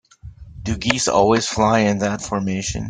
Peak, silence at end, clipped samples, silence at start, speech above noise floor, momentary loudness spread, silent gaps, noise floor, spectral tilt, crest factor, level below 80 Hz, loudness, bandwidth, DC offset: 0 dBFS; 0 s; under 0.1%; 0.25 s; 21 dB; 8 LU; none; -40 dBFS; -4.5 dB/octave; 18 dB; -40 dBFS; -19 LUFS; 9.6 kHz; under 0.1%